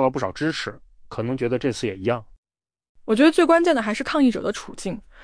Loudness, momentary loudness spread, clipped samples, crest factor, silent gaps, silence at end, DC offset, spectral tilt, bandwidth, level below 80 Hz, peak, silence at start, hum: -22 LUFS; 15 LU; under 0.1%; 16 dB; 2.38-2.43 s, 2.89-2.95 s; 0 s; under 0.1%; -5.5 dB/octave; 10.5 kHz; -52 dBFS; -6 dBFS; 0 s; none